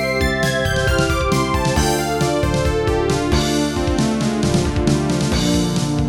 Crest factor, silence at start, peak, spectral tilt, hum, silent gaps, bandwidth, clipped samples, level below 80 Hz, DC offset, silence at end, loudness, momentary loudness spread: 14 dB; 0 s; -4 dBFS; -5 dB/octave; none; none; 17.5 kHz; under 0.1%; -28 dBFS; under 0.1%; 0 s; -18 LUFS; 1 LU